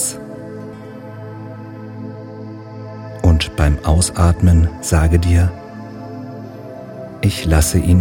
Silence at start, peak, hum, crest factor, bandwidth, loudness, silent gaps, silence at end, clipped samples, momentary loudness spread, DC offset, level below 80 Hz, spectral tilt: 0 s; 0 dBFS; none; 16 dB; 16.5 kHz; -15 LUFS; none; 0 s; under 0.1%; 19 LU; under 0.1%; -24 dBFS; -5.5 dB/octave